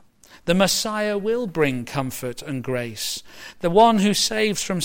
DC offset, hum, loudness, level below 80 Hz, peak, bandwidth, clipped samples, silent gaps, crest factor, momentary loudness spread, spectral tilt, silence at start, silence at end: under 0.1%; none; -21 LUFS; -50 dBFS; -4 dBFS; 16.5 kHz; under 0.1%; none; 18 dB; 14 LU; -4 dB/octave; 0.35 s; 0 s